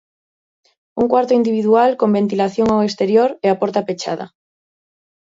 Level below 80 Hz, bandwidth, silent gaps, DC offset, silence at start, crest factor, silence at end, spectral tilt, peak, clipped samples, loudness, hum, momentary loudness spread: -54 dBFS; 7.8 kHz; none; under 0.1%; 0.95 s; 16 dB; 1 s; -6.5 dB/octave; 0 dBFS; under 0.1%; -16 LUFS; none; 10 LU